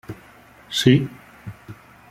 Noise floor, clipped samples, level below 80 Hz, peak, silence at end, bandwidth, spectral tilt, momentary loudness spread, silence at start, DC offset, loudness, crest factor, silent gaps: -48 dBFS; under 0.1%; -54 dBFS; -2 dBFS; 0.35 s; 15.5 kHz; -5.5 dB/octave; 25 LU; 0.1 s; under 0.1%; -19 LUFS; 22 dB; none